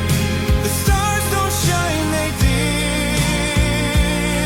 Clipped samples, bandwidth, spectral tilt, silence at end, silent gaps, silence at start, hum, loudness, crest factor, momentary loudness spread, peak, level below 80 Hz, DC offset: under 0.1%; 17 kHz; -4.5 dB/octave; 0 s; none; 0 s; none; -18 LUFS; 14 dB; 2 LU; -4 dBFS; -24 dBFS; under 0.1%